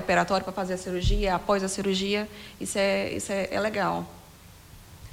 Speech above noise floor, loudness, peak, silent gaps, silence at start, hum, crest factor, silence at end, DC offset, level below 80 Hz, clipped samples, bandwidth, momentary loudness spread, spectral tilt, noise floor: 23 dB; -27 LUFS; -10 dBFS; none; 0 s; none; 18 dB; 0 s; under 0.1%; -38 dBFS; under 0.1%; 16.5 kHz; 9 LU; -4.5 dB/octave; -50 dBFS